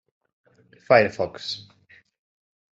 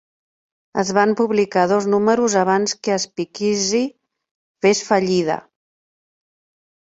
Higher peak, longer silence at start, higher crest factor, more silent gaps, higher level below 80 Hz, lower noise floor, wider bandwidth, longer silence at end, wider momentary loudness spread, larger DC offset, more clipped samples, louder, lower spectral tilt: about the same, -2 dBFS vs -2 dBFS; first, 0.9 s vs 0.75 s; first, 24 dB vs 18 dB; second, none vs 4.31-4.55 s; about the same, -66 dBFS vs -62 dBFS; second, -57 dBFS vs under -90 dBFS; about the same, 8 kHz vs 8 kHz; second, 1.15 s vs 1.45 s; first, 14 LU vs 7 LU; neither; neither; second, -22 LUFS vs -19 LUFS; about the same, -5 dB/octave vs -4 dB/octave